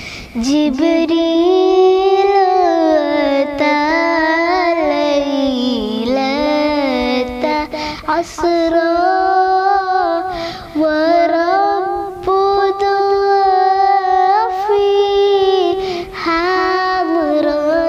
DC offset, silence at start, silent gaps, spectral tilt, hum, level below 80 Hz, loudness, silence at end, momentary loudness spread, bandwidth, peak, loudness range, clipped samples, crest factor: under 0.1%; 0 s; none; -4.5 dB/octave; none; -42 dBFS; -14 LUFS; 0 s; 6 LU; 10.5 kHz; -2 dBFS; 3 LU; under 0.1%; 12 dB